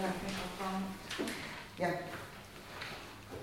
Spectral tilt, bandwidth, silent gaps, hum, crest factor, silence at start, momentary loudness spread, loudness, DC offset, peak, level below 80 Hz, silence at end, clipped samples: -4.5 dB/octave; 16.5 kHz; none; none; 18 dB; 0 s; 11 LU; -41 LUFS; under 0.1%; -22 dBFS; -60 dBFS; 0 s; under 0.1%